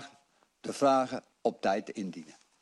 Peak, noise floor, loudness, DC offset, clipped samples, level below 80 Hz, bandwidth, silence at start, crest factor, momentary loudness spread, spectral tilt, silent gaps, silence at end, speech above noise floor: -14 dBFS; -67 dBFS; -31 LUFS; under 0.1%; under 0.1%; -76 dBFS; 12 kHz; 0 s; 20 dB; 18 LU; -5 dB/octave; none; 0.3 s; 37 dB